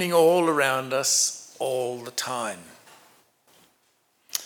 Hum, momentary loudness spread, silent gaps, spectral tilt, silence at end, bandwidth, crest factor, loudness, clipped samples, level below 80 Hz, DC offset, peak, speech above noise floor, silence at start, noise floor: none; 13 LU; none; -2.5 dB/octave; 0 s; 20 kHz; 22 dB; -24 LUFS; under 0.1%; -84 dBFS; under 0.1%; -6 dBFS; 44 dB; 0 s; -67 dBFS